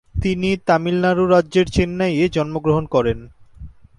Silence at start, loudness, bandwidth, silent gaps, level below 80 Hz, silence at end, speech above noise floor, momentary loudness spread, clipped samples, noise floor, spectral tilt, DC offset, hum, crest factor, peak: 0.15 s; -18 LUFS; 11.5 kHz; none; -36 dBFS; 0.25 s; 22 dB; 5 LU; under 0.1%; -39 dBFS; -7 dB/octave; under 0.1%; none; 16 dB; -2 dBFS